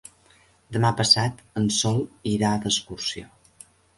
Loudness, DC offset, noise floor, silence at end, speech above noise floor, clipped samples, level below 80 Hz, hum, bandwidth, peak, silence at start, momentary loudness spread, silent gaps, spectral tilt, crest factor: -23 LUFS; under 0.1%; -58 dBFS; 0.75 s; 34 dB; under 0.1%; -54 dBFS; none; 11.5 kHz; -4 dBFS; 0.7 s; 12 LU; none; -4 dB/octave; 22 dB